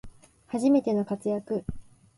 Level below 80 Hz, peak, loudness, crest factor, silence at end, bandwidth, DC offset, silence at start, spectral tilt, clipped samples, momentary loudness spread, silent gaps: -52 dBFS; -12 dBFS; -27 LUFS; 16 dB; 0.35 s; 11.5 kHz; under 0.1%; 0.05 s; -7.5 dB/octave; under 0.1%; 11 LU; none